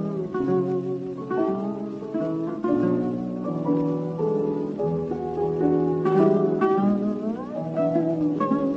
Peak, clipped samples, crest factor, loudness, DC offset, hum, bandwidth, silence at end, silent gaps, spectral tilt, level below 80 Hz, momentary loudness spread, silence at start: -8 dBFS; under 0.1%; 16 dB; -25 LUFS; under 0.1%; none; 7.2 kHz; 0 s; none; -10 dB/octave; -58 dBFS; 8 LU; 0 s